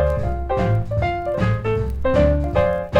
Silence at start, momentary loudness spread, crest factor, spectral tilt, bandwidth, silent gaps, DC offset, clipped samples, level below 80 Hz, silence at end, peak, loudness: 0 s; 5 LU; 16 dB; -8.5 dB/octave; 7.8 kHz; none; under 0.1%; under 0.1%; -26 dBFS; 0 s; -2 dBFS; -20 LUFS